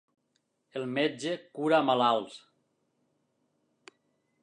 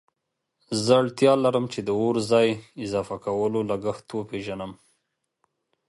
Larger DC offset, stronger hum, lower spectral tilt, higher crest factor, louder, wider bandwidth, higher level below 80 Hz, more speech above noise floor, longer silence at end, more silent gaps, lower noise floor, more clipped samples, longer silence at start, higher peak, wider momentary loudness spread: neither; neither; about the same, -5 dB/octave vs -5.5 dB/octave; about the same, 20 dB vs 20 dB; second, -29 LUFS vs -24 LUFS; about the same, 10.5 kHz vs 11.5 kHz; second, -88 dBFS vs -60 dBFS; second, 49 dB vs 57 dB; first, 2.05 s vs 1.15 s; neither; second, -77 dBFS vs -81 dBFS; neither; about the same, 0.75 s vs 0.7 s; second, -12 dBFS vs -4 dBFS; about the same, 14 LU vs 13 LU